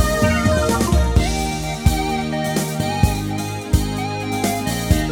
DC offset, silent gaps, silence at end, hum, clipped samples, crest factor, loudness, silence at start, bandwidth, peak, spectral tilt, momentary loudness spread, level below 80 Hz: under 0.1%; none; 0 s; none; under 0.1%; 18 dB; -20 LUFS; 0 s; 18 kHz; -2 dBFS; -5 dB/octave; 6 LU; -24 dBFS